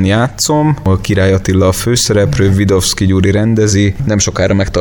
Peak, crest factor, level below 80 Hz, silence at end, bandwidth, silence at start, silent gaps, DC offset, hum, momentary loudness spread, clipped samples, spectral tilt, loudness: 0 dBFS; 10 dB; -28 dBFS; 0 s; 17.5 kHz; 0 s; none; under 0.1%; none; 2 LU; under 0.1%; -5 dB/octave; -11 LUFS